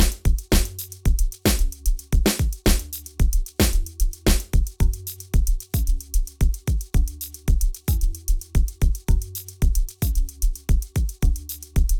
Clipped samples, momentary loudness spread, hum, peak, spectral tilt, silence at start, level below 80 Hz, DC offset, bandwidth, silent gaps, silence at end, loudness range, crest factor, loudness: under 0.1%; 6 LU; none; -8 dBFS; -4.5 dB/octave; 0 s; -22 dBFS; under 0.1%; 19.5 kHz; none; 0 s; 2 LU; 12 dB; -25 LUFS